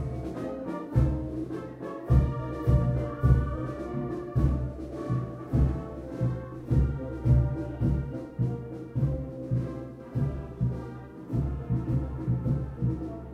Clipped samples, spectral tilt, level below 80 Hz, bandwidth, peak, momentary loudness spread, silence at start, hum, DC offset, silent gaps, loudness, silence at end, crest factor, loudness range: under 0.1%; -10 dB/octave; -34 dBFS; 5.4 kHz; -10 dBFS; 11 LU; 0 s; none; under 0.1%; none; -30 LUFS; 0 s; 20 dB; 4 LU